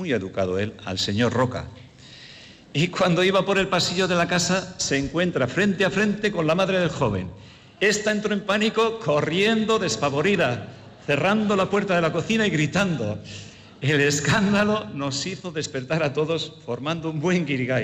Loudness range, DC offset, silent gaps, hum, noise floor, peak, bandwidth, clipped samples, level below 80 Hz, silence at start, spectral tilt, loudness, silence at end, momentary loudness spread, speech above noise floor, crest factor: 2 LU; under 0.1%; none; none; -46 dBFS; -10 dBFS; 14.5 kHz; under 0.1%; -54 dBFS; 0 s; -4.5 dB/octave; -23 LUFS; 0 s; 10 LU; 23 dB; 12 dB